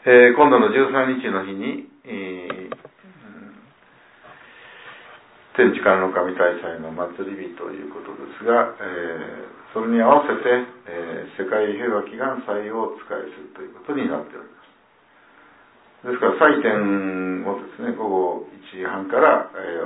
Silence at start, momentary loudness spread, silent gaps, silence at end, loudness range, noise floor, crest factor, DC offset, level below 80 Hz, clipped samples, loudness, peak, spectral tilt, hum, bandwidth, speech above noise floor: 0.05 s; 20 LU; none; 0 s; 11 LU; -55 dBFS; 20 dB; under 0.1%; -68 dBFS; under 0.1%; -20 LUFS; -2 dBFS; -9.5 dB/octave; none; 4 kHz; 35 dB